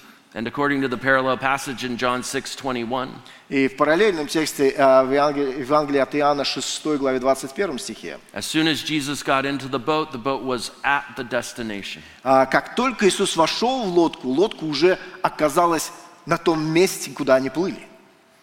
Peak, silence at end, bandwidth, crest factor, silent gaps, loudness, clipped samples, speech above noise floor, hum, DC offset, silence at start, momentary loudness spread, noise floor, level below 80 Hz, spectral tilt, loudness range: -2 dBFS; 0.55 s; 16.5 kHz; 18 dB; none; -21 LUFS; under 0.1%; 30 dB; none; under 0.1%; 0.35 s; 11 LU; -52 dBFS; -52 dBFS; -4 dB/octave; 4 LU